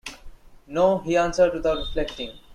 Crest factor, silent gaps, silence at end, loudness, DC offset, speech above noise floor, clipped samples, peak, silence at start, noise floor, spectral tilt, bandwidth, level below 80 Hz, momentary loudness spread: 16 dB; none; 0 s; -23 LUFS; under 0.1%; 20 dB; under 0.1%; -8 dBFS; 0.05 s; -43 dBFS; -5 dB/octave; 11.5 kHz; -40 dBFS; 12 LU